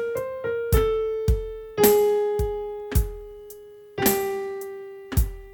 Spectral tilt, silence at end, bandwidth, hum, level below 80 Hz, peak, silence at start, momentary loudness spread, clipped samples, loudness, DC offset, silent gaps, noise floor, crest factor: -5 dB/octave; 0 s; 19 kHz; none; -30 dBFS; -4 dBFS; 0 s; 19 LU; under 0.1%; -24 LUFS; under 0.1%; none; -44 dBFS; 22 dB